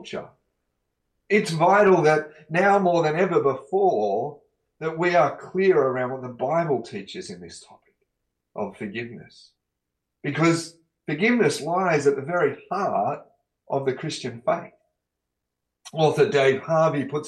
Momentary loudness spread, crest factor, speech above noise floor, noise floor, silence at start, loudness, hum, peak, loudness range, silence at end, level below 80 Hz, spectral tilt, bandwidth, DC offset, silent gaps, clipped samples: 16 LU; 16 dB; 60 dB; -82 dBFS; 0 s; -22 LUFS; 60 Hz at -55 dBFS; -8 dBFS; 10 LU; 0 s; -68 dBFS; -6 dB/octave; 12.5 kHz; under 0.1%; none; under 0.1%